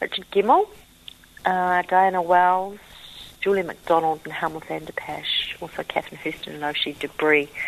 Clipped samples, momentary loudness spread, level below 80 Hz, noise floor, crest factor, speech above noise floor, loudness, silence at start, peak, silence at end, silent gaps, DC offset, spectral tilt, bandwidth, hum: under 0.1%; 14 LU; -58 dBFS; -47 dBFS; 18 dB; 24 dB; -23 LUFS; 0 s; -4 dBFS; 0 s; none; under 0.1%; -4.5 dB/octave; 13.5 kHz; none